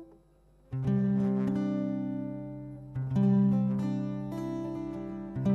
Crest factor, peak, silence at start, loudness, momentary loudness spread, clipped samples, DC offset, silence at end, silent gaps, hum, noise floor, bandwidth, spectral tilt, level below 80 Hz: 14 dB; -16 dBFS; 0 s; -31 LUFS; 13 LU; under 0.1%; under 0.1%; 0 s; none; 50 Hz at -55 dBFS; -61 dBFS; 6.4 kHz; -10 dB/octave; -56 dBFS